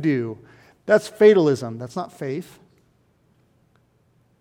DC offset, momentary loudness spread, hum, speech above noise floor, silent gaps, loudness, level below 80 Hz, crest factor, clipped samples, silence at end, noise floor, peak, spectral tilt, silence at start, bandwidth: under 0.1%; 18 LU; none; 42 dB; none; -20 LUFS; -68 dBFS; 20 dB; under 0.1%; 1.95 s; -62 dBFS; -2 dBFS; -6.5 dB/octave; 0 s; 13 kHz